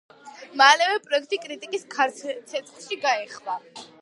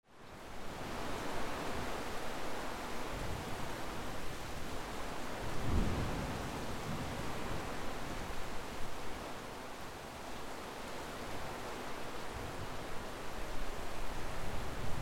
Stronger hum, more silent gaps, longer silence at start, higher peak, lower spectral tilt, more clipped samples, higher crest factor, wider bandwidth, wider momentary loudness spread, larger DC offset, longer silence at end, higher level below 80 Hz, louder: neither; neither; first, 0.25 s vs 0.1 s; first, 0 dBFS vs -20 dBFS; second, 0 dB/octave vs -4.5 dB/octave; neither; first, 24 dB vs 18 dB; second, 11.5 kHz vs 16.5 kHz; first, 18 LU vs 5 LU; neither; first, 0.2 s vs 0 s; second, -86 dBFS vs -46 dBFS; first, -23 LUFS vs -43 LUFS